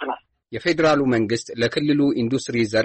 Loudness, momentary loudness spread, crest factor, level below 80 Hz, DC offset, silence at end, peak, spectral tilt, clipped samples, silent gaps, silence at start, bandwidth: -21 LUFS; 11 LU; 14 dB; -54 dBFS; under 0.1%; 0 s; -8 dBFS; -5.5 dB/octave; under 0.1%; none; 0 s; 8.8 kHz